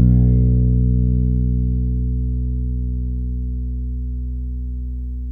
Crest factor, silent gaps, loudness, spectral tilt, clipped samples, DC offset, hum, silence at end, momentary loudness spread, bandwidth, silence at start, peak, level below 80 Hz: 14 dB; none; -21 LUFS; -14.5 dB/octave; under 0.1%; under 0.1%; 60 Hz at -65 dBFS; 0 s; 12 LU; 0.8 kHz; 0 s; -4 dBFS; -20 dBFS